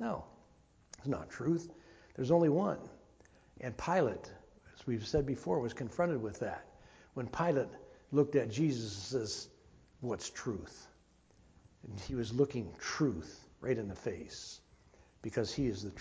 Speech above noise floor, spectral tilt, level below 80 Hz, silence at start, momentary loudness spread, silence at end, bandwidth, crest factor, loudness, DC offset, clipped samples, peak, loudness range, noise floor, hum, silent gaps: 31 dB; -6 dB/octave; -58 dBFS; 0 s; 18 LU; 0 s; 8 kHz; 20 dB; -36 LUFS; under 0.1%; under 0.1%; -16 dBFS; 5 LU; -66 dBFS; none; none